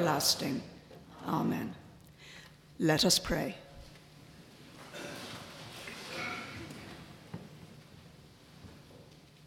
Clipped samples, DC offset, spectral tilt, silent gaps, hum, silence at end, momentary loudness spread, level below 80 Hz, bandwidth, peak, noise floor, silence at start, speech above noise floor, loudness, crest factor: under 0.1%; under 0.1%; -3.5 dB/octave; none; none; 0 s; 27 LU; -60 dBFS; 17.5 kHz; -12 dBFS; -56 dBFS; 0 s; 25 dB; -33 LUFS; 24 dB